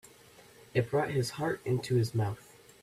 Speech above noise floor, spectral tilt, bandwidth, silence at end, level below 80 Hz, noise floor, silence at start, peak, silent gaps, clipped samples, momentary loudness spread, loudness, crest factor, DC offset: 26 dB; -6.5 dB/octave; 15 kHz; 0.4 s; -64 dBFS; -57 dBFS; 0.75 s; -14 dBFS; none; under 0.1%; 5 LU; -32 LUFS; 18 dB; under 0.1%